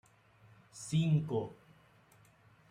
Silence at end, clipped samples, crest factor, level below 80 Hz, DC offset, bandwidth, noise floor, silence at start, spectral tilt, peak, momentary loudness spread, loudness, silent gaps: 1.15 s; under 0.1%; 18 dB; -70 dBFS; under 0.1%; 10.5 kHz; -64 dBFS; 0.75 s; -7 dB/octave; -20 dBFS; 17 LU; -34 LUFS; none